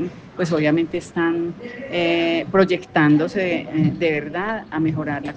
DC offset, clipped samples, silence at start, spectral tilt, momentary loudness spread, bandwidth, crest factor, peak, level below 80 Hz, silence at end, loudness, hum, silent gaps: under 0.1%; under 0.1%; 0 s; -7 dB/octave; 8 LU; 8.8 kHz; 18 dB; -2 dBFS; -54 dBFS; 0 s; -20 LUFS; none; none